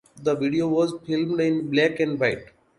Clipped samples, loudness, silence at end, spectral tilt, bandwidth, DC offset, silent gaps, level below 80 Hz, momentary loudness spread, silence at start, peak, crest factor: under 0.1%; -23 LUFS; 0.35 s; -6.5 dB/octave; 11.5 kHz; under 0.1%; none; -60 dBFS; 5 LU; 0.15 s; -6 dBFS; 18 dB